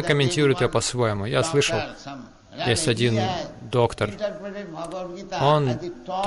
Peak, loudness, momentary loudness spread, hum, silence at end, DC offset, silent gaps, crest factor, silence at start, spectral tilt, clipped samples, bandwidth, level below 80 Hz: -6 dBFS; -23 LUFS; 14 LU; none; 0 s; under 0.1%; none; 18 dB; 0 s; -4.5 dB/octave; under 0.1%; 11.5 kHz; -48 dBFS